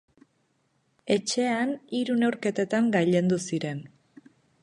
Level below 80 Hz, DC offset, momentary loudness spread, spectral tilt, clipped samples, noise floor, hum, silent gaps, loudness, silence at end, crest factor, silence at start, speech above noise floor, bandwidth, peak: -72 dBFS; under 0.1%; 8 LU; -5.5 dB/octave; under 0.1%; -71 dBFS; none; none; -26 LUFS; 0.75 s; 18 dB; 1.05 s; 45 dB; 11 kHz; -10 dBFS